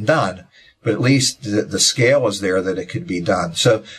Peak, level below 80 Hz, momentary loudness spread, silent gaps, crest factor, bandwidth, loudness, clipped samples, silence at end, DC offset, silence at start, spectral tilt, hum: -2 dBFS; -48 dBFS; 10 LU; none; 16 dB; 14 kHz; -18 LUFS; under 0.1%; 0 s; under 0.1%; 0 s; -4 dB/octave; none